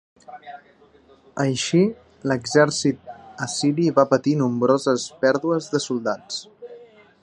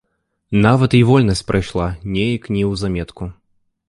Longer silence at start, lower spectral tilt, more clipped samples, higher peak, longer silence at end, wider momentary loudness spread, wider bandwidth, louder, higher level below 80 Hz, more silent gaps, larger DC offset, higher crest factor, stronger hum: second, 0.3 s vs 0.5 s; second, -5 dB/octave vs -7 dB/octave; neither; about the same, -2 dBFS vs -2 dBFS; second, 0.4 s vs 0.55 s; first, 22 LU vs 13 LU; about the same, 11 kHz vs 11.5 kHz; second, -21 LUFS vs -17 LUFS; second, -64 dBFS vs -36 dBFS; neither; neither; about the same, 20 dB vs 16 dB; neither